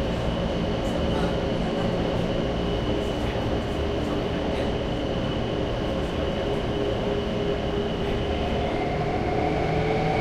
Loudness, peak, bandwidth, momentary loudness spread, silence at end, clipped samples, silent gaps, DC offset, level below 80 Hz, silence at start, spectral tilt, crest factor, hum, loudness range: -26 LUFS; -12 dBFS; 13 kHz; 2 LU; 0 s; under 0.1%; none; under 0.1%; -34 dBFS; 0 s; -7 dB/octave; 14 dB; none; 1 LU